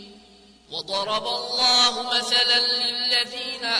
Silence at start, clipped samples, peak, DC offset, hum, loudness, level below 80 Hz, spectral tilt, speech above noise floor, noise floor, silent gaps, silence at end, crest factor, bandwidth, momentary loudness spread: 0 s; under 0.1%; -8 dBFS; under 0.1%; none; -20 LUFS; -64 dBFS; 0 dB/octave; 29 dB; -52 dBFS; none; 0 s; 16 dB; 11 kHz; 11 LU